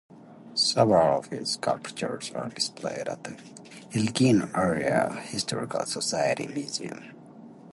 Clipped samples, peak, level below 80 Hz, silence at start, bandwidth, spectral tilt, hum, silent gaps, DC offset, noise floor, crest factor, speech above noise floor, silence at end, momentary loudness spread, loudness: under 0.1%; -6 dBFS; -62 dBFS; 0.1 s; 11.5 kHz; -4.5 dB/octave; none; none; under 0.1%; -47 dBFS; 22 dB; 20 dB; 0 s; 16 LU; -27 LUFS